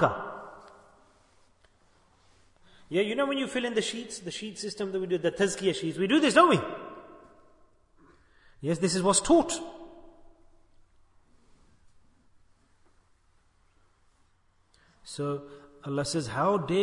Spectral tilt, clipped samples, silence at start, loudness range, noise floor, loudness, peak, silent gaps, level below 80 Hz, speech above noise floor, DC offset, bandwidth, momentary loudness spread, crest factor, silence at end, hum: -4 dB/octave; under 0.1%; 0 s; 11 LU; -66 dBFS; -27 LUFS; -6 dBFS; none; -60 dBFS; 39 dB; under 0.1%; 11 kHz; 22 LU; 24 dB; 0 s; none